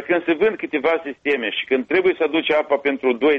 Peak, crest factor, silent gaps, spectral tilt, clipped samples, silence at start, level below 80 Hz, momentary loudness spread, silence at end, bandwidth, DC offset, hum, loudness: -6 dBFS; 12 dB; none; -6 dB/octave; under 0.1%; 0 s; -62 dBFS; 4 LU; 0 s; 6 kHz; under 0.1%; none; -20 LUFS